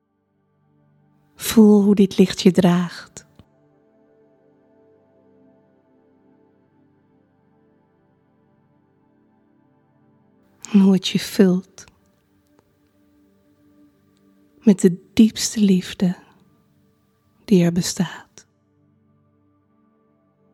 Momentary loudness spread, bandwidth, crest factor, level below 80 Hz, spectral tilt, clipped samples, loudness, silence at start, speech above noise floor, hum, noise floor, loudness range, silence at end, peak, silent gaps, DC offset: 15 LU; 15 kHz; 22 dB; -58 dBFS; -6 dB/octave; under 0.1%; -17 LUFS; 1.4 s; 51 dB; none; -67 dBFS; 7 LU; 2.35 s; 0 dBFS; none; under 0.1%